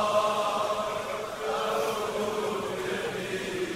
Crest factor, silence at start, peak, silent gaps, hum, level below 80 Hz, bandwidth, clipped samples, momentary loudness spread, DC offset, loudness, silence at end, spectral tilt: 16 dB; 0 s; -12 dBFS; none; none; -60 dBFS; 16 kHz; under 0.1%; 6 LU; under 0.1%; -30 LUFS; 0 s; -3.5 dB/octave